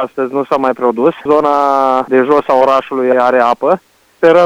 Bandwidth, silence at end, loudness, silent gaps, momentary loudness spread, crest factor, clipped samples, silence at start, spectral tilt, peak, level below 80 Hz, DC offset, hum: 10.5 kHz; 0 s; -12 LUFS; none; 5 LU; 12 dB; 0.5%; 0 s; -6.5 dB/octave; 0 dBFS; -56 dBFS; under 0.1%; none